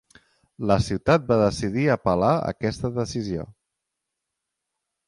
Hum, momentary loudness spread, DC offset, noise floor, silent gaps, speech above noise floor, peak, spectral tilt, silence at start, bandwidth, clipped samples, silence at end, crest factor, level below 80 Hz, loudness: none; 10 LU; under 0.1%; -83 dBFS; none; 60 dB; -4 dBFS; -6.5 dB/octave; 0.6 s; 11.5 kHz; under 0.1%; 1.55 s; 20 dB; -46 dBFS; -23 LUFS